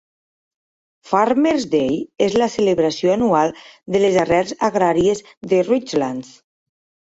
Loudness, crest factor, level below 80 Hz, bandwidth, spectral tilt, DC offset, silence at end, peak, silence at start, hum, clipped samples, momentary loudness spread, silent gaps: -18 LUFS; 16 dB; -52 dBFS; 8 kHz; -5.5 dB/octave; under 0.1%; 0.85 s; -2 dBFS; 1.05 s; none; under 0.1%; 6 LU; 5.37-5.41 s